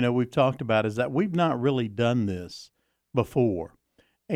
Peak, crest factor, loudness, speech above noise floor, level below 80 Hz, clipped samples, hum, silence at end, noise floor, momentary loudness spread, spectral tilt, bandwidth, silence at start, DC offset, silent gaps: -8 dBFS; 18 dB; -26 LUFS; 42 dB; -60 dBFS; under 0.1%; none; 0 s; -67 dBFS; 11 LU; -7.5 dB/octave; 14.5 kHz; 0 s; under 0.1%; none